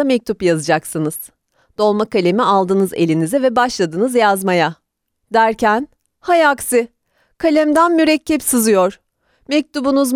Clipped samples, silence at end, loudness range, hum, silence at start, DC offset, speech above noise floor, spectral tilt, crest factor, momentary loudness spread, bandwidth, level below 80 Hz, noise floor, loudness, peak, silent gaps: under 0.1%; 0 s; 2 LU; none; 0 s; under 0.1%; 57 dB; -4.5 dB/octave; 14 dB; 8 LU; 18 kHz; -52 dBFS; -72 dBFS; -15 LUFS; -2 dBFS; none